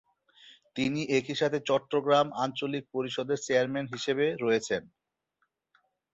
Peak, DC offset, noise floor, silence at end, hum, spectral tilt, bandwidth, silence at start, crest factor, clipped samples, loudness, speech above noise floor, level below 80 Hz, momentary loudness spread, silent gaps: -12 dBFS; under 0.1%; -79 dBFS; 1.3 s; none; -4.5 dB/octave; 8.2 kHz; 0.45 s; 18 dB; under 0.1%; -29 LUFS; 50 dB; -70 dBFS; 8 LU; none